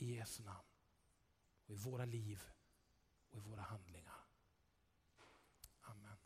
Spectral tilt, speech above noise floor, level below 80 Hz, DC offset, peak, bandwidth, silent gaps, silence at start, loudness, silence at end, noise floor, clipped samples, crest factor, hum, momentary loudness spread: -5.5 dB/octave; 29 dB; -76 dBFS; under 0.1%; -34 dBFS; 15.5 kHz; none; 0 s; -53 LUFS; 0 s; -80 dBFS; under 0.1%; 20 dB; none; 17 LU